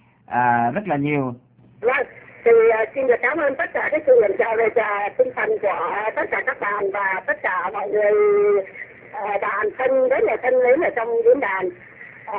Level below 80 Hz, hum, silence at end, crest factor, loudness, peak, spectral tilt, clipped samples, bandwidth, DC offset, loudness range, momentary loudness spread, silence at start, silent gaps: -60 dBFS; none; 0 s; 16 dB; -20 LUFS; -4 dBFS; -9.5 dB/octave; under 0.1%; 4 kHz; under 0.1%; 3 LU; 9 LU; 0.3 s; none